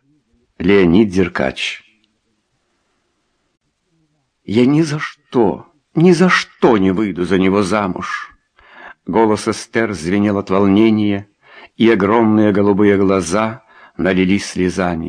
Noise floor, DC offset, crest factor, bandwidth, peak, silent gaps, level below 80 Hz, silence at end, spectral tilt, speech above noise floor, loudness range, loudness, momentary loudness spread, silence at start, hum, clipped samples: -66 dBFS; under 0.1%; 16 dB; 10.5 kHz; 0 dBFS; none; -48 dBFS; 0 s; -6 dB/octave; 52 dB; 7 LU; -15 LUFS; 11 LU; 0.6 s; none; under 0.1%